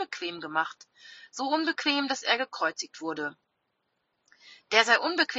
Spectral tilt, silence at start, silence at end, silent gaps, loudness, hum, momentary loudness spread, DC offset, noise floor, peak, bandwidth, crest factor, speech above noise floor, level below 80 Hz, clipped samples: 1 dB/octave; 0 s; 0 s; none; -27 LUFS; none; 13 LU; under 0.1%; -78 dBFS; -4 dBFS; 8 kHz; 26 dB; 49 dB; -82 dBFS; under 0.1%